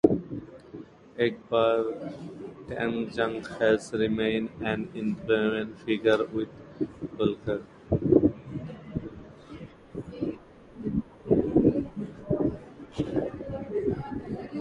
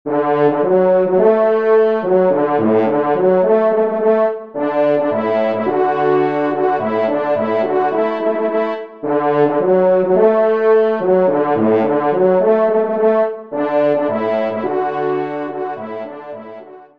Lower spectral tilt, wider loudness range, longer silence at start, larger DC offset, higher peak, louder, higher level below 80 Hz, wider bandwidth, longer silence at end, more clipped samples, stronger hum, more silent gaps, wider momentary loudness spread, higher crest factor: second, -7.5 dB/octave vs -9.5 dB/octave; about the same, 3 LU vs 4 LU; about the same, 0.05 s vs 0.05 s; second, under 0.1% vs 0.4%; about the same, -2 dBFS vs 0 dBFS; second, -29 LUFS vs -15 LUFS; first, -50 dBFS vs -66 dBFS; first, 11 kHz vs 5.2 kHz; second, 0 s vs 0.15 s; neither; neither; neither; first, 18 LU vs 8 LU; first, 26 dB vs 14 dB